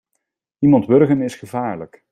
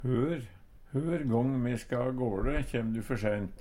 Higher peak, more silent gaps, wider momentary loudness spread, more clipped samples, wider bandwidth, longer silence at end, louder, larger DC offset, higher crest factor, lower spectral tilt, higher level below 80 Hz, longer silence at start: first, -2 dBFS vs -16 dBFS; neither; first, 13 LU vs 6 LU; neither; second, 10 kHz vs 15.5 kHz; first, 0.25 s vs 0 s; first, -17 LUFS vs -32 LUFS; neither; about the same, 16 dB vs 16 dB; about the same, -8.5 dB/octave vs -8 dB/octave; second, -56 dBFS vs -42 dBFS; first, 0.6 s vs 0 s